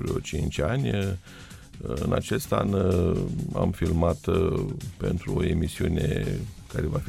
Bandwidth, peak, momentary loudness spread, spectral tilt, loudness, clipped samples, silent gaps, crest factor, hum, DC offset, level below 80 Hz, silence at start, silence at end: 16 kHz; -8 dBFS; 10 LU; -7 dB/octave; -27 LUFS; under 0.1%; none; 18 dB; none; under 0.1%; -38 dBFS; 0 s; 0 s